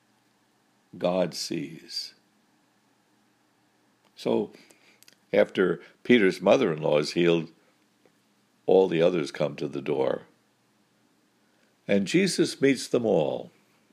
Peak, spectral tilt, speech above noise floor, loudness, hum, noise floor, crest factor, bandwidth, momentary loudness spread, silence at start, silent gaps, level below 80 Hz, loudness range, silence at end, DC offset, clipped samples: -6 dBFS; -5 dB/octave; 42 dB; -25 LUFS; none; -67 dBFS; 20 dB; 14.5 kHz; 13 LU; 0.95 s; none; -72 dBFS; 10 LU; 0.45 s; under 0.1%; under 0.1%